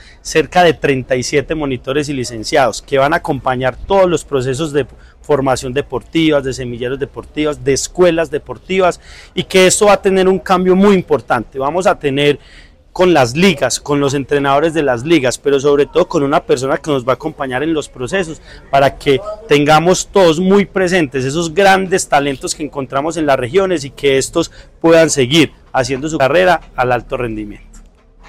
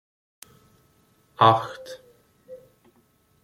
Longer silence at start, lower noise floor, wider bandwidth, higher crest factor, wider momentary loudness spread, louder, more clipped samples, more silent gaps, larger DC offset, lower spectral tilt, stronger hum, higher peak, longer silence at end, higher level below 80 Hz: second, 0.25 s vs 1.4 s; second, -41 dBFS vs -63 dBFS; about the same, 16 kHz vs 16 kHz; second, 12 dB vs 26 dB; second, 10 LU vs 28 LU; first, -14 LUFS vs -21 LUFS; neither; neither; neither; about the same, -4.5 dB/octave vs -5.5 dB/octave; neither; about the same, -2 dBFS vs -2 dBFS; second, 0.5 s vs 0.85 s; first, -38 dBFS vs -66 dBFS